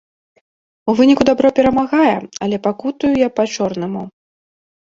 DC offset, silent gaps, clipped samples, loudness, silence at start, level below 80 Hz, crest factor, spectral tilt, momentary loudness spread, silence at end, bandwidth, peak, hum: under 0.1%; none; under 0.1%; -16 LUFS; 0.85 s; -48 dBFS; 16 dB; -5.5 dB/octave; 12 LU; 0.85 s; 7.6 kHz; 0 dBFS; none